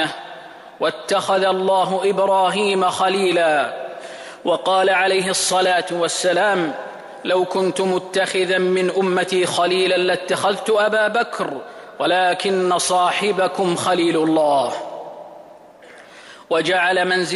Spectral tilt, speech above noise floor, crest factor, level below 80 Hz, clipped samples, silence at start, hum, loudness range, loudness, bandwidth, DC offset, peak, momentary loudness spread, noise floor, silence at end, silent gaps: -3.5 dB/octave; 25 dB; 12 dB; -68 dBFS; under 0.1%; 0 s; none; 2 LU; -18 LUFS; 12 kHz; under 0.1%; -8 dBFS; 13 LU; -43 dBFS; 0 s; none